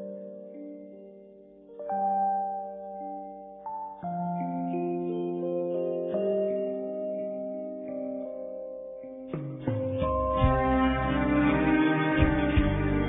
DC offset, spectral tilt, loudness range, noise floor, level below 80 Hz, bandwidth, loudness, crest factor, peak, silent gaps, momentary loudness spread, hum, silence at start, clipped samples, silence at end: under 0.1%; -11.5 dB/octave; 8 LU; -51 dBFS; -40 dBFS; 4 kHz; -29 LUFS; 20 dB; -10 dBFS; none; 17 LU; none; 0 s; under 0.1%; 0 s